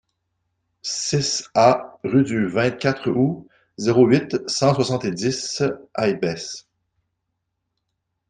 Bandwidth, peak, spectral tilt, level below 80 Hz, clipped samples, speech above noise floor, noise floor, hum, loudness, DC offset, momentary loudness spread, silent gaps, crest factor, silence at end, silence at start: 9.8 kHz; -2 dBFS; -5 dB/octave; -58 dBFS; under 0.1%; 57 dB; -77 dBFS; none; -21 LUFS; under 0.1%; 9 LU; none; 20 dB; 1.7 s; 0.85 s